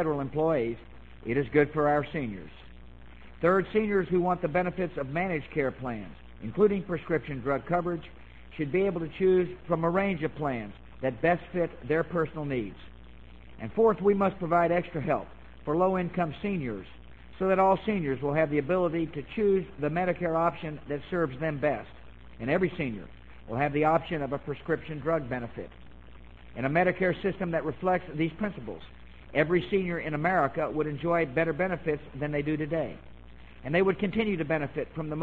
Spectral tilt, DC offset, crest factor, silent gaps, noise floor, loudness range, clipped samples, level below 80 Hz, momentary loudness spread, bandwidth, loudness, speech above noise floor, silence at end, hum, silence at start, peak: -9.5 dB/octave; 0.3%; 20 dB; none; -50 dBFS; 3 LU; under 0.1%; -52 dBFS; 12 LU; 7.6 kHz; -29 LUFS; 22 dB; 0 s; none; 0 s; -8 dBFS